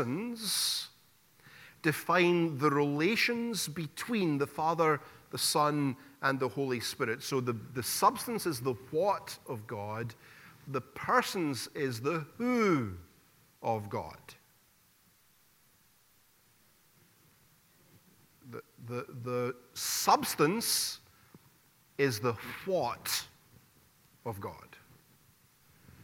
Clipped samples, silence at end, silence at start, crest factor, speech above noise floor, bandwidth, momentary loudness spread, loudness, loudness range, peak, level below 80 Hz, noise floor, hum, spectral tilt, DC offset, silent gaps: under 0.1%; 0 s; 0 s; 22 dB; 35 dB; 17.5 kHz; 15 LU; -32 LUFS; 12 LU; -12 dBFS; -72 dBFS; -67 dBFS; none; -4 dB/octave; under 0.1%; none